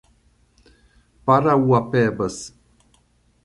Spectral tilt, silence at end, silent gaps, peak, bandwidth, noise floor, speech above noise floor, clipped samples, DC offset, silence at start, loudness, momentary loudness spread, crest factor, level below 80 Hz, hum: -7 dB/octave; 0.95 s; none; -2 dBFS; 11.5 kHz; -60 dBFS; 42 dB; under 0.1%; under 0.1%; 1.25 s; -19 LUFS; 15 LU; 20 dB; -54 dBFS; none